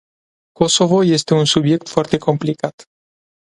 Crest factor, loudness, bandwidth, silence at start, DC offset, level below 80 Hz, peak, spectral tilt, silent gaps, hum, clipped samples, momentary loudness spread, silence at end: 18 dB; -16 LUFS; 11.5 kHz; 0.6 s; under 0.1%; -52 dBFS; 0 dBFS; -5 dB/octave; 2.73-2.78 s; none; under 0.1%; 8 LU; 0.6 s